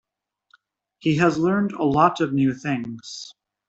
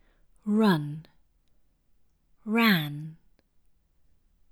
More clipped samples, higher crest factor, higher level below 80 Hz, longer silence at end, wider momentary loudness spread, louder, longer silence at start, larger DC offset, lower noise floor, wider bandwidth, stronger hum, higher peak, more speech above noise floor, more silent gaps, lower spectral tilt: neither; about the same, 20 dB vs 22 dB; first, -58 dBFS vs -68 dBFS; second, 0.35 s vs 1.4 s; second, 16 LU vs 21 LU; first, -21 LUFS vs -25 LUFS; first, 1.05 s vs 0.45 s; neither; first, -73 dBFS vs -65 dBFS; second, 8 kHz vs 17.5 kHz; neither; first, -4 dBFS vs -8 dBFS; first, 51 dB vs 40 dB; neither; about the same, -6.5 dB/octave vs -6.5 dB/octave